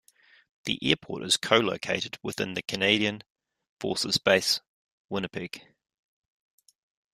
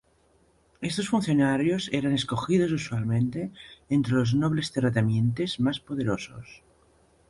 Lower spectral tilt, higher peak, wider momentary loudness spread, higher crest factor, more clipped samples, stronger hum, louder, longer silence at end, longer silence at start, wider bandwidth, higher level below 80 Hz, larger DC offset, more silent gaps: second, -3 dB/octave vs -6.5 dB/octave; first, -4 dBFS vs -10 dBFS; first, 14 LU vs 10 LU; first, 26 dB vs 16 dB; neither; neither; about the same, -27 LUFS vs -26 LUFS; first, 1.55 s vs 0.75 s; second, 0.65 s vs 0.8 s; first, 15.5 kHz vs 11.5 kHz; second, -66 dBFS vs -56 dBFS; neither; first, 3.30-3.35 s, 3.69-3.77 s, 4.67-5.09 s vs none